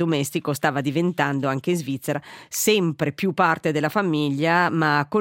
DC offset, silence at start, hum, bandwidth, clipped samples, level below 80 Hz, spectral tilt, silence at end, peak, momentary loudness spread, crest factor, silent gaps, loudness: under 0.1%; 0 s; none; 17 kHz; under 0.1%; -66 dBFS; -5 dB/octave; 0 s; -4 dBFS; 6 LU; 18 dB; none; -22 LUFS